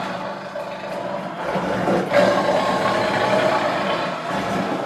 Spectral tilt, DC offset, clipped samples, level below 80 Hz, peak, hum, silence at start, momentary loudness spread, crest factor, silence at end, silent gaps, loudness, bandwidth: -5 dB/octave; under 0.1%; under 0.1%; -54 dBFS; -4 dBFS; none; 0 s; 12 LU; 16 dB; 0 s; none; -21 LUFS; 14 kHz